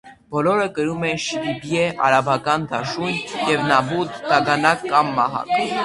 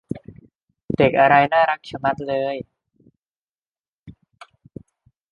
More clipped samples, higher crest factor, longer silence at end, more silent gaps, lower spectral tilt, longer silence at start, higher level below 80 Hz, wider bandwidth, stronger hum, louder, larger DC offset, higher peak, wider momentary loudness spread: neither; about the same, 20 dB vs 20 dB; second, 0 s vs 1.2 s; second, none vs 3.18-3.22 s, 3.30-3.48 s, 3.60-3.73 s, 3.80-4.06 s; second, -4.5 dB/octave vs -7.5 dB/octave; about the same, 0.05 s vs 0.1 s; about the same, -56 dBFS vs -54 dBFS; first, 11.5 kHz vs 7 kHz; neither; about the same, -20 LUFS vs -18 LUFS; neither; about the same, 0 dBFS vs -2 dBFS; second, 7 LU vs 20 LU